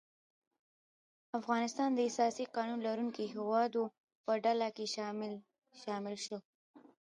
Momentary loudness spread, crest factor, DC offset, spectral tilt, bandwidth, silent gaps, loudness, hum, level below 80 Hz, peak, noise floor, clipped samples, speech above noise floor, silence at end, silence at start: 11 LU; 18 dB; under 0.1%; -4 dB/octave; 11 kHz; 4.00-4.08 s, 4.15-4.24 s, 6.45-6.74 s; -37 LUFS; none; -88 dBFS; -20 dBFS; under -90 dBFS; under 0.1%; over 54 dB; 0.2 s; 1.35 s